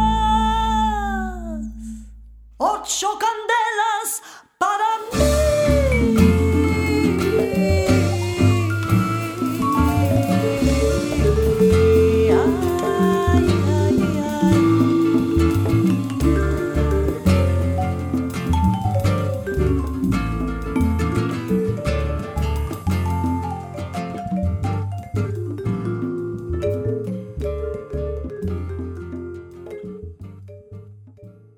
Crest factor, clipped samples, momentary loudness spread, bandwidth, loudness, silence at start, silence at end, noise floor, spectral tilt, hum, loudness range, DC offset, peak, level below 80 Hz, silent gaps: 18 dB; under 0.1%; 12 LU; 18 kHz; -20 LUFS; 0 s; 0.25 s; -44 dBFS; -6.5 dB/octave; none; 9 LU; under 0.1%; -2 dBFS; -30 dBFS; none